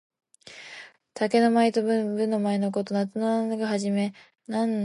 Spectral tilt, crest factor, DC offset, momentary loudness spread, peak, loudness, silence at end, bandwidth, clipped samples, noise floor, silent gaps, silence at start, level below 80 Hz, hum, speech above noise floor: -6 dB/octave; 16 dB; under 0.1%; 21 LU; -10 dBFS; -25 LUFS; 0 s; 11.5 kHz; under 0.1%; -47 dBFS; none; 0.45 s; -76 dBFS; none; 22 dB